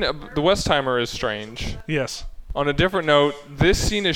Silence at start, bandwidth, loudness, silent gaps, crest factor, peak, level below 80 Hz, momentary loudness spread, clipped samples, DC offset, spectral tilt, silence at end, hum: 0 s; 17 kHz; -21 LUFS; none; 18 dB; -4 dBFS; -34 dBFS; 12 LU; under 0.1%; under 0.1%; -4.5 dB/octave; 0 s; none